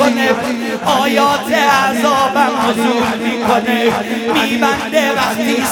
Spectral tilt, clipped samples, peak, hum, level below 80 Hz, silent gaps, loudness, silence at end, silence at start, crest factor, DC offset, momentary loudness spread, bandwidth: -3.5 dB/octave; under 0.1%; 0 dBFS; none; -52 dBFS; none; -14 LUFS; 0 s; 0 s; 14 dB; under 0.1%; 4 LU; 19.5 kHz